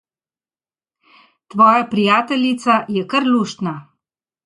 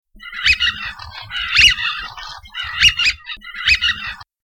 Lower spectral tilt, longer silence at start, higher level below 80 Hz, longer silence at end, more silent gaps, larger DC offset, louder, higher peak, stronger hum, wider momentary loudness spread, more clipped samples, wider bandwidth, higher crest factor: first, -5.5 dB/octave vs 0.5 dB/octave; first, 1.55 s vs 0.15 s; second, -66 dBFS vs -38 dBFS; first, 0.65 s vs 0.2 s; neither; neither; about the same, -16 LUFS vs -14 LUFS; about the same, 0 dBFS vs 0 dBFS; neither; second, 13 LU vs 19 LU; neither; second, 11.5 kHz vs 18.5 kHz; about the same, 18 dB vs 18 dB